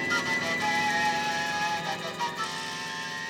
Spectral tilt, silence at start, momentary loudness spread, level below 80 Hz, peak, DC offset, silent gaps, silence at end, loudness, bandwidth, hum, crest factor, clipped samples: -2.5 dB/octave; 0 s; 8 LU; -70 dBFS; -16 dBFS; under 0.1%; none; 0 s; -28 LUFS; over 20 kHz; none; 14 dB; under 0.1%